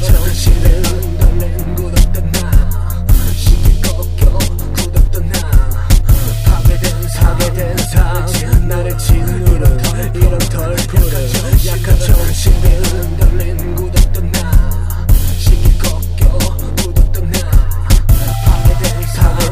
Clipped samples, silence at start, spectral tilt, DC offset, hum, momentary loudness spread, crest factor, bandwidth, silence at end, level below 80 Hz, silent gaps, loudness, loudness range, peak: 0.9%; 0 s; -5 dB/octave; 2%; none; 5 LU; 10 dB; 16.5 kHz; 0 s; -12 dBFS; none; -14 LUFS; 1 LU; 0 dBFS